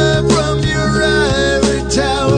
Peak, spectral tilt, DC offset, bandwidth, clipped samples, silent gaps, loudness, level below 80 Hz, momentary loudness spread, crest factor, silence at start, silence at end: 0 dBFS; -5 dB/octave; under 0.1%; 10 kHz; under 0.1%; none; -14 LUFS; -26 dBFS; 3 LU; 12 dB; 0 s; 0 s